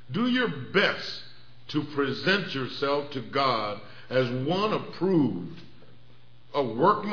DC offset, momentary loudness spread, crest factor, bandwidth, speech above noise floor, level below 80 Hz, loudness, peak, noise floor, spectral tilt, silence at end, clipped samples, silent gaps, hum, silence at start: 0.7%; 11 LU; 20 dB; 5.4 kHz; 29 dB; -68 dBFS; -27 LUFS; -8 dBFS; -56 dBFS; -6.5 dB/octave; 0 s; under 0.1%; none; none; 0.1 s